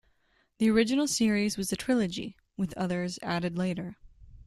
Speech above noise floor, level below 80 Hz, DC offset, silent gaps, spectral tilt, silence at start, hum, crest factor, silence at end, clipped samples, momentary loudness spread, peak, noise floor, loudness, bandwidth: 41 dB; -58 dBFS; under 0.1%; none; -4.5 dB/octave; 0.6 s; none; 18 dB; 0.05 s; under 0.1%; 12 LU; -12 dBFS; -70 dBFS; -29 LUFS; 13 kHz